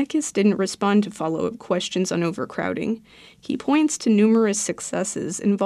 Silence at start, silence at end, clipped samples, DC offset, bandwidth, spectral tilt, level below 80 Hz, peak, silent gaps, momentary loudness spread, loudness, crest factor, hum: 0 s; 0 s; under 0.1%; under 0.1%; 12.5 kHz; -5 dB/octave; -62 dBFS; -8 dBFS; none; 9 LU; -22 LUFS; 14 dB; none